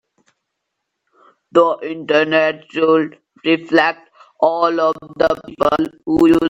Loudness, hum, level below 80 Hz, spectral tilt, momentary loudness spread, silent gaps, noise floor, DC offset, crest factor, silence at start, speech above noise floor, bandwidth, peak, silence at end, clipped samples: -17 LUFS; none; -52 dBFS; -6 dB/octave; 6 LU; none; -76 dBFS; under 0.1%; 16 dB; 1.55 s; 60 dB; 8 kHz; 0 dBFS; 0 s; under 0.1%